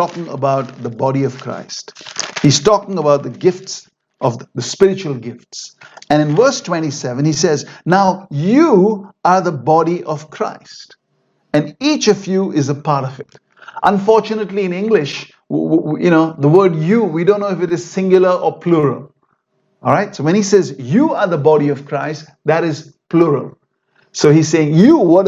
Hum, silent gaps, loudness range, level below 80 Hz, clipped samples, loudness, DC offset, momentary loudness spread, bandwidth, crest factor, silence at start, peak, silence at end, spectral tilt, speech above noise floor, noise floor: none; none; 4 LU; -56 dBFS; under 0.1%; -15 LUFS; under 0.1%; 14 LU; 8 kHz; 14 dB; 0 s; 0 dBFS; 0 s; -6 dB/octave; 49 dB; -63 dBFS